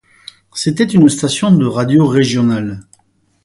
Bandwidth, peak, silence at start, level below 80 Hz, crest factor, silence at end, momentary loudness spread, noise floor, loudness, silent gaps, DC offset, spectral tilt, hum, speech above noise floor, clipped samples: 11.5 kHz; 0 dBFS; 0.55 s; -48 dBFS; 14 dB; 0.65 s; 12 LU; -58 dBFS; -13 LUFS; none; under 0.1%; -6 dB/octave; none; 46 dB; under 0.1%